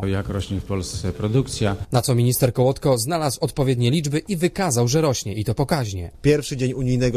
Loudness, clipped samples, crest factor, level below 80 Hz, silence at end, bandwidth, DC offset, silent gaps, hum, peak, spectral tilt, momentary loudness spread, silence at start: -21 LUFS; under 0.1%; 16 dB; -40 dBFS; 0 s; 14.5 kHz; under 0.1%; none; none; -4 dBFS; -5.5 dB/octave; 7 LU; 0 s